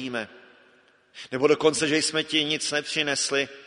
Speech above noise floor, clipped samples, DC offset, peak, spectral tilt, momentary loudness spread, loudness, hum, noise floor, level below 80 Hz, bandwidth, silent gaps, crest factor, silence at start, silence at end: 34 dB; under 0.1%; under 0.1%; -6 dBFS; -2.5 dB/octave; 13 LU; -24 LUFS; none; -59 dBFS; -70 dBFS; 11 kHz; none; 20 dB; 0 s; 0 s